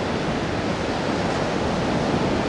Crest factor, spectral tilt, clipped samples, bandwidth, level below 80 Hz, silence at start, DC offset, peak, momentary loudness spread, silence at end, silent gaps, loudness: 12 dB; -5.5 dB/octave; under 0.1%; 11.5 kHz; -40 dBFS; 0 s; under 0.1%; -10 dBFS; 3 LU; 0 s; none; -24 LUFS